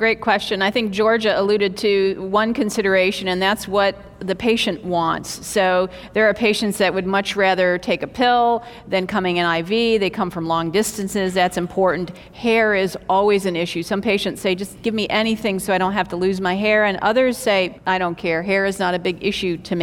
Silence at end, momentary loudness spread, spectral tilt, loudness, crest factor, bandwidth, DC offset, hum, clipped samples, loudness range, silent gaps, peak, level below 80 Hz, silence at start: 0 s; 6 LU; -4.5 dB/octave; -19 LUFS; 16 dB; 17.5 kHz; under 0.1%; none; under 0.1%; 2 LU; none; -2 dBFS; -50 dBFS; 0 s